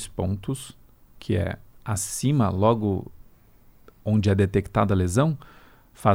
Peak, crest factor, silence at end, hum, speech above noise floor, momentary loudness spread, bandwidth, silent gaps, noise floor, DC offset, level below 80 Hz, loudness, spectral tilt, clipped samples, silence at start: -6 dBFS; 18 dB; 0 s; none; 30 dB; 14 LU; 16.5 kHz; none; -53 dBFS; under 0.1%; -48 dBFS; -24 LUFS; -6.5 dB/octave; under 0.1%; 0 s